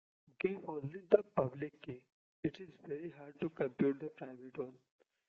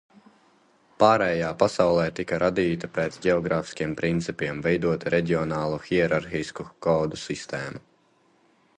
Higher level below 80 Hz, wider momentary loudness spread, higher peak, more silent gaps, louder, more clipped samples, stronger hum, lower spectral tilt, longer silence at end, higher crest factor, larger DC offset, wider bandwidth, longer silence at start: second, -76 dBFS vs -52 dBFS; first, 18 LU vs 10 LU; second, -10 dBFS vs -2 dBFS; first, 2.12-2.43 s vs none; second, -39 LUFS vs -25 LUFS; neither; neither; about the same, -7 dB/octave vs -6 dB/octave; second, 0.55 s vs 1 s; first, 28 dB vs 22 dB; neither; second, 6.2 kHz vs 10.5 kHz; second, 0.45 s vs 1 s